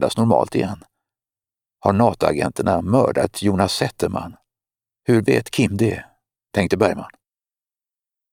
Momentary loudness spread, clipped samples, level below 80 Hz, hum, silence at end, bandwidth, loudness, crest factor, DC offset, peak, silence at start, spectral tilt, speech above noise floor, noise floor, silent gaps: 12 LU; under 0.1%; -50 dBFS; none; 1.25 s; 16.5 kHz; -20 LUFS; 20 dB; under 0.1%; 0 dBFS; 0 s; -6 dB/octave; over 71 dB; under -90 dBFS; none